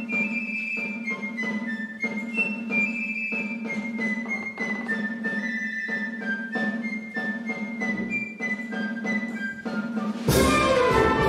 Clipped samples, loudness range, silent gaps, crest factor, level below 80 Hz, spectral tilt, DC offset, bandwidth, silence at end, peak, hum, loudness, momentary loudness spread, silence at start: under 0.1%; 3 LU; none; 18 dB; -46 dBFS; -5 dB/octave; under 0.1%; 16 kHz; 0 s; -8 dBFS; none; -26 LUFS; 10 LU; 0 s